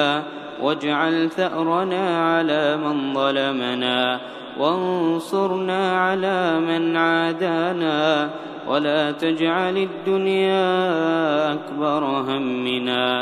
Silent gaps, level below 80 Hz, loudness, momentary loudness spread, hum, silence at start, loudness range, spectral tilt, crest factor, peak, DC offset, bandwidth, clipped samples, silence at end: none; -70 dBFS; -21 LUFS; 4 LU; none; 0 s; 1 LU; -6 dB/octave; 16 dB; -4 dBFS; under 0.1%; 12.5 kHz; under 0.1%; 0 s